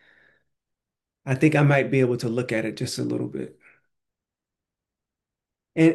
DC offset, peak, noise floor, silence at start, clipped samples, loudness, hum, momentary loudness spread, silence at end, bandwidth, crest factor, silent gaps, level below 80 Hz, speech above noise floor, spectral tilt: under 0.1%; -4 dBFS; -88 dBFS; 1.25 s; under 0.1%; -23 LUFS; none; 15 LU; 0 s; 12.5 kHz; 20 dB; none; -68 dBFS; 65 dB; -7 dB/octave